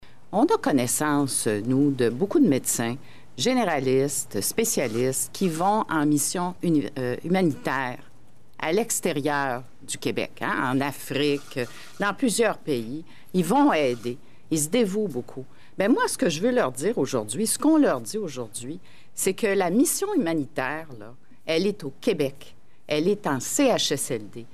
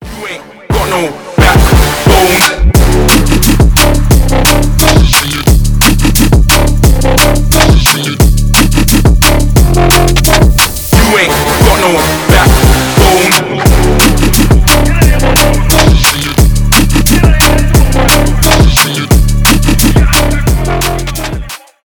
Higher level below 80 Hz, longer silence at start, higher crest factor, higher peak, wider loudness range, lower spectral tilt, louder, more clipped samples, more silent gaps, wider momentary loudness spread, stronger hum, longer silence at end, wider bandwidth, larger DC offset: second, -64 dBFS vs -10 dBFS; about the same, 0 s vs 0 s; first, 16 dB vs 6 dB; second, -8 dBFS vs 0 dBFS; first, 4 LU vs 1 LU; about the same, -4 dB/octave vs -4 dB/octave; second, -24 LUFS vs -7 LUFS; second, under 0.1% vs 0.7%; neither; first, 12 LU vs 5 LU; neither; second, 0.1 s vs 0.25 s; second, 15.5 kHz vs over 20 kHz; about the same, 1% vs 0.9%